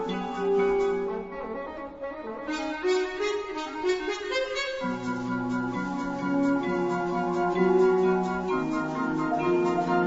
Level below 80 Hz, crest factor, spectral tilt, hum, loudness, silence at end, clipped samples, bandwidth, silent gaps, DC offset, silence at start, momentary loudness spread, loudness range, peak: -54 dBFS; 16 dB; -6 dB/octave; none; -27 LUFS; 0 s; under 0.1%; 8 kHz; none; under 0.1%; 0 s; 11 LU; 5 LU; -12 dBFS